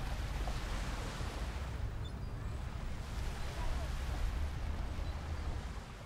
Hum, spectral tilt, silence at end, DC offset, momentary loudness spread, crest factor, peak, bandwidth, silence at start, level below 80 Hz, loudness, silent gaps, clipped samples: none; -5.5 dB/octave; 0 s; under 0.1%; 4 LU; 14 dB; -24 dBFS; 16 kHz; 0 s; -40 dBFS; -42 LUFS; none; under 0.1%